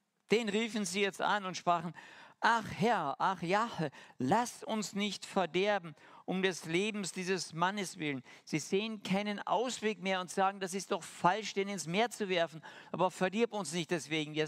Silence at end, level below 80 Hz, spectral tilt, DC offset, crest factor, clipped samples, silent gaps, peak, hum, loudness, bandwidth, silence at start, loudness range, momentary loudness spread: 0 s; -76 dBFS; -4 dB/octave; under 0.1%; 22 dB; under 0.1%; none; -12 dBFS; none; -34 LUFS; 15.5 kHz; 0.3 s; 2 LU; 7 LU